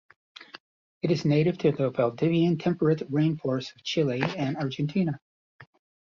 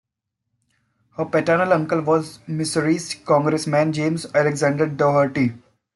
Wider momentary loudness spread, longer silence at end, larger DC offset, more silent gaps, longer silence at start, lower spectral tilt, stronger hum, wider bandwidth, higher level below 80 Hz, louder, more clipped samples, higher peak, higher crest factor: about the same, 7 LU vs 6 LU; about the same, 0.4 s vs 0.35 s; neither; first, 0.60-1.01 s, 5.22-5.59 s vs none; second, 0.4 s vs 1.2 s; first, -7.5 dB/octave vs -6 dB/octave; neither; second, 7.2 kHz vs 12 kHz; about the same, -66 dBFS vs -62 dBFS; second, -26 LUFS vs -20 LUFS; neither; second, -8 dBFS vs -4 dBFS; about the same, 18 dB vs 16 dB